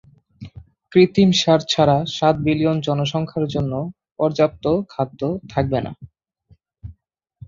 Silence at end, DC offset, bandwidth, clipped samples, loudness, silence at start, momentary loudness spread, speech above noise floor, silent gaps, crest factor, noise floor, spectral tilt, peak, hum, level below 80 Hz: 0.55 s; under 0.1%; 7.6 kHz; under 0.1%; -19 LUFS; 0.4 s; 12 LU; 41 dB; none; 18 dB; -59 dBFS; -6 dB/octave; -2 dBFS; none; -48 dBFS